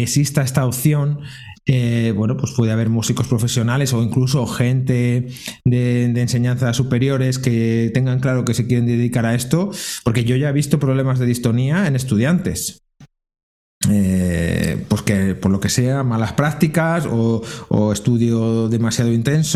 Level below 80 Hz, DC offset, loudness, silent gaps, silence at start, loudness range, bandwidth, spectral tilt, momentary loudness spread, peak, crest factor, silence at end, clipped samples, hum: -44 dBFS; under 0.1%; -18 LUFS; 13.43-13.81 s; 0 s; 2 LU; 14.5 kHz; -6 dB/octave; 3 LU; 0 dBFS; 16 dB; 0 s; under 0.1%; none